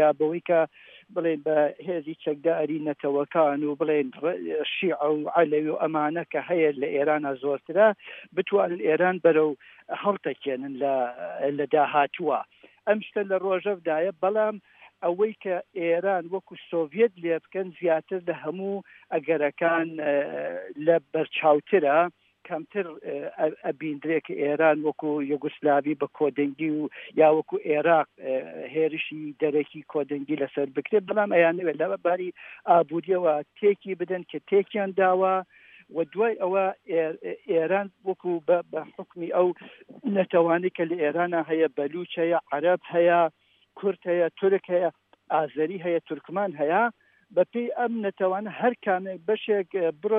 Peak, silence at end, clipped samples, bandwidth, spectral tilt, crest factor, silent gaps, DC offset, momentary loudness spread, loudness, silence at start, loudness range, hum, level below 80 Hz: -6 dBFS; 0 s; under 0.1%; 3.8 kHz; -9.5 dB/octave; 18 dB; none; under 0.1%; 10 LU; -26 LUFS; 0 s; 3 LU; none; -84 dBFS